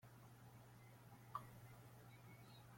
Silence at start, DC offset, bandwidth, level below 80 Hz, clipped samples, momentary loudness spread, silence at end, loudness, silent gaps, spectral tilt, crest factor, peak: 0 s; under 0.1%; 16.5 kHz; -80 dBFS; under 0.1%; 9 LU; 0 s; -61 LUFS; none; -5.5 dB/octave; 26 dB; -34 dBFS